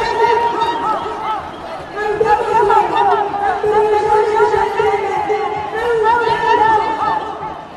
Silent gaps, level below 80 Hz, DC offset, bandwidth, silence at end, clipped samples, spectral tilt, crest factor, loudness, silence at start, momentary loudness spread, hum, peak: none; -44 dBFS; under 0.1%; 12 kHz; 0 s; under 0.1%; -4.5 dB/octave; 14 dB; -15 LUFS; 0 s; 9 LU; none; 0 dBFS